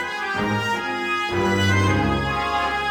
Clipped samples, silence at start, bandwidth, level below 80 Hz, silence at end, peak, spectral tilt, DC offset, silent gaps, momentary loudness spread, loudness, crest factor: under 0.1%; 0 s; 17 kHz; -40 dBFS; 0 s; -8 dBFS; -5 dB/octave; under 0.1%; none; 5 LU; -21 LUFS; 14 dB